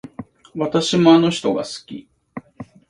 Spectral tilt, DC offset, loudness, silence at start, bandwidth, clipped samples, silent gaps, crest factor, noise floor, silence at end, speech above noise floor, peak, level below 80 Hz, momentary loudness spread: -5.5 dB/octave; under 0.1%; -17 LUFS; 0.05 s; 11 kHz; under 0.1%; none; 18 dB; -40 dBFS; 0.25 s; 23 dB; 0 dBFS; -58 dBFS; 25 LU